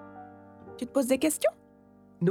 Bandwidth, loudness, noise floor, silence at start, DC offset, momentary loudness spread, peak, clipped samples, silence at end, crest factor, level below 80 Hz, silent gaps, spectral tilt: 18 kHz; -28 LUFS; -57 dBFS; 0 s; under 0.1%; 23 LU; -12 dBFS; under 0.1%; 0 s; 18 dB; -68 dBFS; none; -5 dB/octave